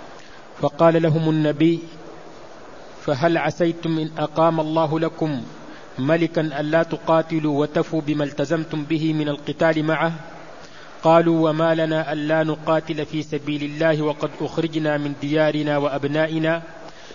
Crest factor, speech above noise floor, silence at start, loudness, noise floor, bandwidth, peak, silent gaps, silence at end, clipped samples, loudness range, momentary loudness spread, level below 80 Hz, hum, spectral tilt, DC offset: 18 dB; 22 dB; 0 s; -21 LUFS; -42 dBFS; 7.4 kHz; -2 dBFS; none; 0 s; under 0.1%; 2 LU; 21 LU; -56 dBFS; none; -7 dB/octave; 0.7%